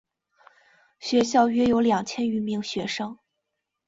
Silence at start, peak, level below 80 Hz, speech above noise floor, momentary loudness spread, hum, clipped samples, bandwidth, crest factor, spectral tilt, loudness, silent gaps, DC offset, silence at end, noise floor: 1 s; -6 dBFS; -58 dBFS; 58 dB; 11 LU; none; under 0.1%; 8 kHz; 20 dB; -4.5 dB/octave; -24 LUFS; none; under 0.1%; 0.75 s; -81 dBFS